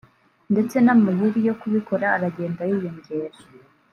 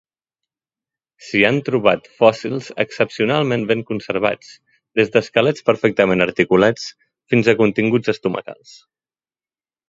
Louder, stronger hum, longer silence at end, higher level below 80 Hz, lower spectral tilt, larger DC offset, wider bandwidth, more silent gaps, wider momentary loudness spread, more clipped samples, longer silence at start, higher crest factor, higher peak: second, -22 LUFS vs -17 LUFS; neither; second, 0.65 s vs 1.35 s; second, -68 dBFS vs -56 dBFS; first, -8.5 dB/octave vs -6 dB/octave; neither; first, 12 kHz vs 7.8 kHz; neither; first, 14 LU vs 9 LU; neither; second, 0.5 s vs 1.25 s; about the same, 16 dB vs 18 dB; second, -6 dBFS vs 0 dBFS